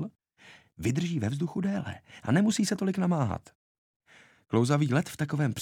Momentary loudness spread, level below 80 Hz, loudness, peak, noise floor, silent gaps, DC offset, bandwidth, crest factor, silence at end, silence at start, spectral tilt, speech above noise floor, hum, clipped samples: 10 LU; -60 dBFS; -29 LUFS; -12 dBFS; -56 dBFS; 3.55-4.00 s; under 0.1%; 16.5 kHz; 18 dB; 0 s; 0 s; -6 dB/octave; 29 dB; none; under 0.1%